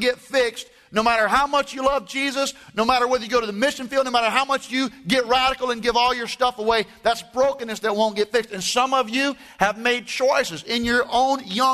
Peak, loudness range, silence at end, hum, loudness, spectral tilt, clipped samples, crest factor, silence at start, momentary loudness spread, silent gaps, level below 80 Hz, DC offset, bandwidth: -2 dBFS; 1 LU; 0 s; none; -21 LUFS; -2.5 dB/octave; under 0.1%; 18 dB; 0 s; 5 LU; none; -50 dBFS; under 0.1%; 13.5 kHz